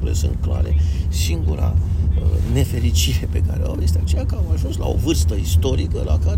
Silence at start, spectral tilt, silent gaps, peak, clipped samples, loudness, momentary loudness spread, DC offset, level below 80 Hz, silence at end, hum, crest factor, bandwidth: 0 s; -6 dB/octave; none; -6 dBFS; under 0.1%; -20 LUFS; 3 LU; under 0.1%; -22 dBFS; 0 s; none; 12 dB; 16 kHz